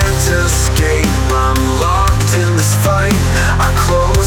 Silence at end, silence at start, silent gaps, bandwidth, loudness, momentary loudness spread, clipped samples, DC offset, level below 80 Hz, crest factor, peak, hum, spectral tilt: 0 s; 0 s; none; 19 kHz; -13 LUFS; 1 LU; under 0.1%; under 0.1%; -18 dBFS; 10 dB; -2 dBFS; none; -4.5 dB/octave